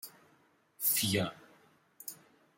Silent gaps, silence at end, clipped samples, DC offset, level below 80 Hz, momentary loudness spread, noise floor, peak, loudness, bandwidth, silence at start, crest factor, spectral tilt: none; 0.45 s; under 0.1%; under 0.1%; -76 dBFS; 21 LU; -69 dBFS; -16 dBFS; -31 LUFS; 16.5 kHz; 0.05 s; 22 dB; -3 dB/octave